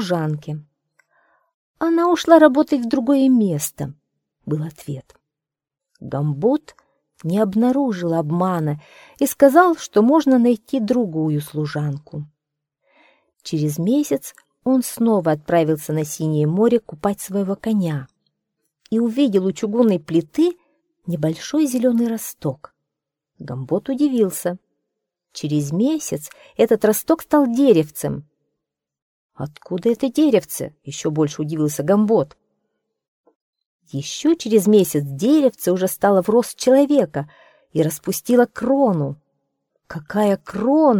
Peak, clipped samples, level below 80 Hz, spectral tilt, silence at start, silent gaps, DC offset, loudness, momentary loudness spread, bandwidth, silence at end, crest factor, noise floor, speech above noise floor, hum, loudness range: 0 dBFS; under 0.1%; -60 dBFS; -6.5 dB/octave; 0 s; 1.54-1.74 s, 29.02-29.29 s, 33.08-33.24 s, 33.36-33.53 s, 33.66-33.79 s; under 0.1%; -19 LUFS; 16 LU; 19 kHz; 0 s; 20 dB; -87 dBFS; 68 dB; none; 7 LU